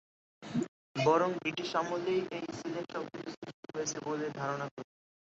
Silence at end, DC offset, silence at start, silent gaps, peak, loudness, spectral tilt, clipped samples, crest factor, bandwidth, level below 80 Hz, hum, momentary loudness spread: 0.35 s; under 0.1%; 0.4 s; 0.68-0.95 s, 3.37-3.42 s, 3.54-3.63 s, 4.71-4.77 s; -14 dBFS; -35 LUFS; -4 dB/octave; under 0.1%; 20 dB; 8 kHz; -74 dBFS; none; 15 LU